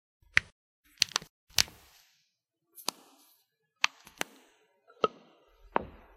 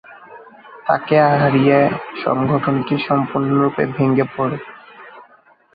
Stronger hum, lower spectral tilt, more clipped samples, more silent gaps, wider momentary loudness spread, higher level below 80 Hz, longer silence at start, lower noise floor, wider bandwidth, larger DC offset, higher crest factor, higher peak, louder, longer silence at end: neither; second, -0.5 dB/octave vs -11 dB/octave; neither; first, 0.52-0.83 s, 1.29-1.47 s vs none; about the same, 11 LU vs 10 LU; second, -62 dBFS vs -56 dBFS; first, 0.35 s vs 0.1 s; first, -80 dBFS vs -51 dBFS; first, 16 kHz vs 5 kHz; neither; first, 36 dB vs 16 dB; about the same, 0 dBFS vs -2 dBFS; second, -32 LUFS vs -17 LUFS; second, 0.3 s vs 0.55 s